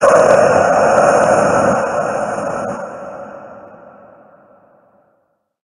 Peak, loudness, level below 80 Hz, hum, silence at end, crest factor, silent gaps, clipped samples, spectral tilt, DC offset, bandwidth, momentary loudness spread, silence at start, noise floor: 0 dBFS; -13 LUFS; -50 dBFS; none; 1.95 s; 16 dB; none; under 0.1%; -5 dB/octave; under 0.1%; 11.5 kHz; 20 LU; 0 s; -64 dBFS